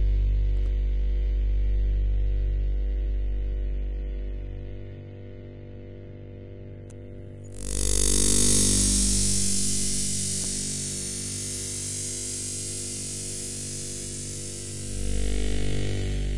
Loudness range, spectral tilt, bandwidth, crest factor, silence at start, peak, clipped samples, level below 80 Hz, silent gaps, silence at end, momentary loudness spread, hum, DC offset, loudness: 15 LU; -3 dB/octave; 11.5 kHz; 18 dB; 0 s; -8 dBFS; under 0.1%; -30 dBFS; none; 0 s; 22 LU; 50 Hz at -40 dBFS; under 0.1%; -26 LUFS